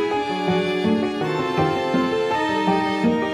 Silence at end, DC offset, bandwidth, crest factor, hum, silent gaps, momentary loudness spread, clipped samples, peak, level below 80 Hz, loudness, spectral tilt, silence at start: 0 s; under 0.1%; 13.5 kHz; 14 dB; none; none; 3 LU; under 0.1%; -8 dBFS; -54 dBFS; -21 LUFS; -6 dB/octave; 0 s